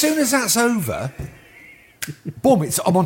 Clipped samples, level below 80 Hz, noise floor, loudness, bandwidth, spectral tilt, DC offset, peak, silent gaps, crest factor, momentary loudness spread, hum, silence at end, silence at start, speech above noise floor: under 0.1%; -50 dBFS; -46 dBFS; -19 LUFS; 17 kHz; -4 dB/octave; under 0.1%; -4 dBFS; none; 16 dB; 15 LU; none; 0 s; 0 s; 27 dB